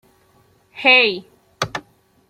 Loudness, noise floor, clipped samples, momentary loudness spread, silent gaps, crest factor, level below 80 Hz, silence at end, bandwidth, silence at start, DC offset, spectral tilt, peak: -16 LUFS; -57 dBFS; under 0.1%; 19 LU; none; 20 dB; -60 dBFS; 0.5 s; 15.5 kHz; 0.75 s; under 0.1%; -3 dB/octave; -2 dBFS